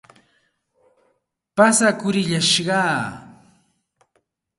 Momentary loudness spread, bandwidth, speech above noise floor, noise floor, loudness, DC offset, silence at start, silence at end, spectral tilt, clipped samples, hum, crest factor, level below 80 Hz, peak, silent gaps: 14 LU; 12 kHz; 51 dB; -69 dBFS; -18 LUFS; under 0.1%; 1.55 s; 1.3 s; -3 dB/octave; under 0.1%; none; 20 dB; -64 dBFS; -2 dBFS; none